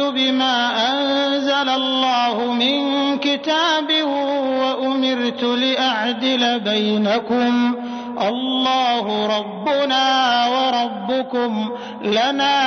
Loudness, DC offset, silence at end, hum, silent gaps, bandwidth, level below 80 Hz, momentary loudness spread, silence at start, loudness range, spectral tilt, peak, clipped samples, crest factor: -18 LUFS; under 0.1%; 0 s; none; none; 6.6 kHz; -66 dBFS; 5 LU; 0 s; 1 LU; -4 dB/octave; -8 dBFS; under 0.1%; 12 dB